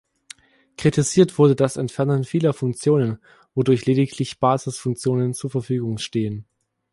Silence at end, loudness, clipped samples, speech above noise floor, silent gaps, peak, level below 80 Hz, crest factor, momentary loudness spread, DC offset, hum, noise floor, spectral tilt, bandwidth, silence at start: 0.5 s; -21 LUFS; under 0.1%; 27 dB; none; -2 dBFS; -56 dBFS; 18 dB; 10 LU; under 0.1%; none; -47 dBFS; -6.5 dB/octave; 11.5 kHz; 0.8 s